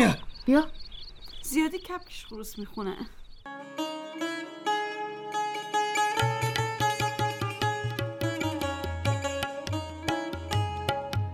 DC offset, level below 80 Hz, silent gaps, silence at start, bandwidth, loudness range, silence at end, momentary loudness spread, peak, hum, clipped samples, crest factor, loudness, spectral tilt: under 0.1%; -48 dBFS; none; 0 s; 17 kHz; 6 LU; 0 s; 14 LU; -8 dBFS; none; under 0.1%; 22 dB; -30 LUFS; -5 dB/octave